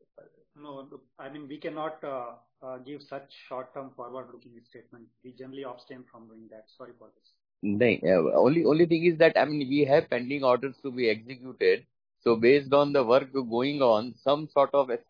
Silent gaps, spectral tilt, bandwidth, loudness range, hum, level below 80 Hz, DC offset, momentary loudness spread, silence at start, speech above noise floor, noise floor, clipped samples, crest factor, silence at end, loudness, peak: none; -8 dB/octave; 5.2 kHz; 20 LU; none; -74 dBFS; under 0.1%; 21 LU; 0.6 s; 27 dB; -54 dBFS; under 0.1%; 18 dB; 0.1 s; -25 LUFS; -8 dBFS